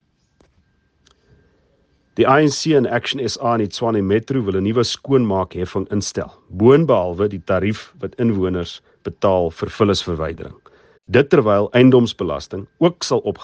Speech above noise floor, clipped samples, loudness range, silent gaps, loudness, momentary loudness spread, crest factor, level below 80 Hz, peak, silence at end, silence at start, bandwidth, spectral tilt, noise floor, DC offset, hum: 44 dB; under 0.1%; 3 LU; none; -18 LUFS; 14 LU; 18 dB; -50 dBFS; 0 dBFS; 0 s; 2.15 s; 9.4 kHz; -6 dB/octave; -61 dBFS; under 0.1%; none